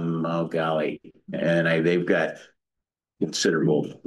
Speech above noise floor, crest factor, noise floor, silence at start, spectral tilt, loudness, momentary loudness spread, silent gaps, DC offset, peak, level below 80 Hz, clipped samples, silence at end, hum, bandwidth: 62 dB; 16 dB; -86 dBFS; 0 s; -5.5 dB/octave; -24 LUFS; 10 LU; none; under 0.1%; -8 dBFS; -68 dBFS; under 0.1%; 0.1 s; none; 12 kHz